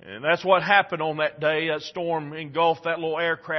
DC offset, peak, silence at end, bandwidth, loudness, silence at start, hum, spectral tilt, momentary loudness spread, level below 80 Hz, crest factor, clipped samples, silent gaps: under 0.1%; -4 dBFS; 0 s; 6.2 kHz; -23 LUFS; 0.05 s; none; -5.5 dB/octave; 9 LU; -70 dBFS; 20 dB; under 0.1%; none